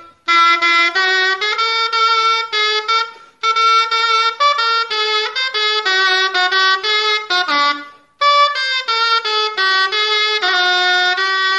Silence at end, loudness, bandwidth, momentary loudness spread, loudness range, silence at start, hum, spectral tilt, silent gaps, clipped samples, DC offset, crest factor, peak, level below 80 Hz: 0 s; -13 LUFS; 11.5 kHz; 4 LU; 1 LU; 0 s; none; 1.5 dB/octave; none; under 0.1%; under 0.1%; 14 dB; -2 dBFS; -72 dBFS